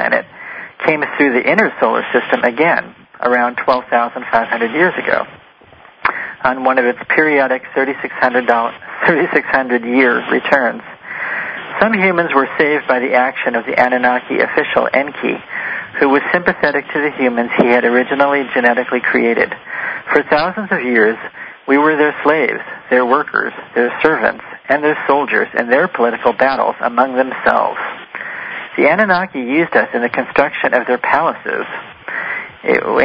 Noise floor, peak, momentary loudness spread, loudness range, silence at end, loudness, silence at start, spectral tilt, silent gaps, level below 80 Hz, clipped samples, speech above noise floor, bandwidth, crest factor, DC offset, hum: -43 dBFS; 0 dBFS; 9 LU; 2 LU; 0 s; -14 LUFS; 0 s; -7 dB/octave; none; -54 dBFS; under 0.1%; 29 dB; 7 kHz; 14 dB; under 0.1%; none